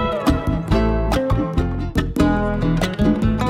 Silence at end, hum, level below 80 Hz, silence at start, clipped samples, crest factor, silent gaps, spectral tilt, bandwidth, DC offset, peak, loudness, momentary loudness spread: 0 s; none; -24 dBFS; 0 s; under 0.1%; 16 dB; none; -7 dB/octave; 15.5 kHz; under 0.1%; -4 dBFS; -20 LUFS; 4 LU